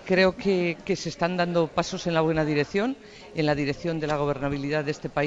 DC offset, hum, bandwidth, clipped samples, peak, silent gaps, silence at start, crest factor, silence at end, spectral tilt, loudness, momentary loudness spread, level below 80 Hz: under 0.1%; none; 8 kHz; under 0.1%; -8 dBFS; none; 0 s; 18 dB; 0 s; -6 dB/octave; -26 LUFS; 6 LU; -50 dBFS